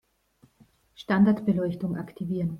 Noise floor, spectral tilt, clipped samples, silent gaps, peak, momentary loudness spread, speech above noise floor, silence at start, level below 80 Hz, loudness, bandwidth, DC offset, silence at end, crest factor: -63 dBFS; -9 dB/octave; under 0.1%; none; -10 dBFS; 11 LU; 38 dB; 1 s; -60 dBFS; -26 LUFS; 5.6 kHz; under 0.1%; 0 s; 18 dB